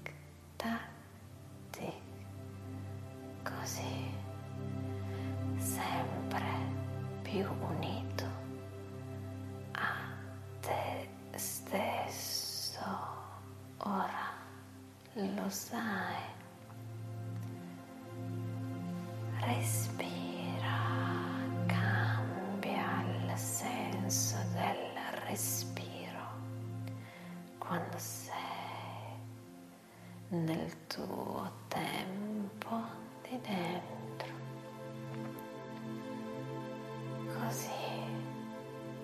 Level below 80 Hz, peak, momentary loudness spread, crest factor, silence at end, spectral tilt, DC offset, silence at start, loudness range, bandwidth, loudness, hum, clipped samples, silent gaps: -62 dBFS; -18 dBFS; 13 LU; 22 dB; 0 s; -4.5 dB/octave; under 0.1%; 0 s; 8 LU; 14.5 kHz; -39 LUFS; none; under 0.1%; none